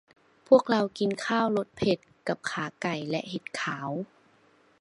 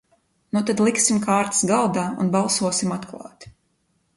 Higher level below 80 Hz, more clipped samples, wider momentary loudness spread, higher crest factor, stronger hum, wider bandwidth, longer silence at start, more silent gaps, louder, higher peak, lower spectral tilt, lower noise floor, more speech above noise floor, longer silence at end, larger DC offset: about the same, -64 dBFS vs -60 dBFS; neither; about the same, 12 LU vs 14 LU; about the same, 22 dB vs 18 dB; neither; about the same, 11 kHz vs 11.5 kHz; about the same, 0.5 s vs 0.55 s; neither; second, -28 LUFS vs -21 LUFS; about the same, -6 dBFS vs -4 dBFS; first, -5.5 dB/octave vs -4 dB/octave; second, -63 dBFS vs -68 dBFS; second, 35 dB vs 47 dB; about the same, 0.75 s vs 0.7 s; neither